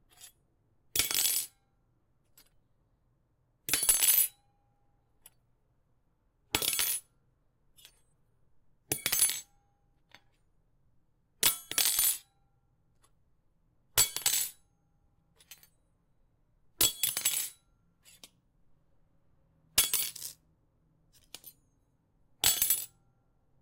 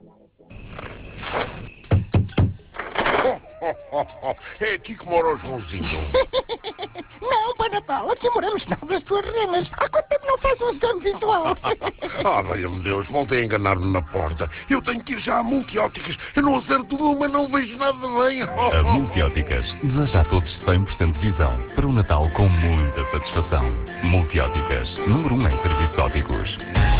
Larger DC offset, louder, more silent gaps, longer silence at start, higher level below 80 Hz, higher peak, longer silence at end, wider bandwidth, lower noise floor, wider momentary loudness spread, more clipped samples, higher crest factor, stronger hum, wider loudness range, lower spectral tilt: neither; second, -28 LUFS vs -22 LUFS; neither; second, 0.2 s vs 0.5 s; second, -64 dBFS vs -28 dBFS; second, -10 dBFS vs -6 dBFS; first, 0.75 s vs 0 s; first, 17 kHz vs 4 kHz; first, -73 dBFS vs -51 dBFS; first, 15 LU vs 9 LU; neither; first, 26 dB vs 16 dB; neither; about the same, 5 LU vs 3 LU; second, 1 dB/octave vs -10.5 dB/octave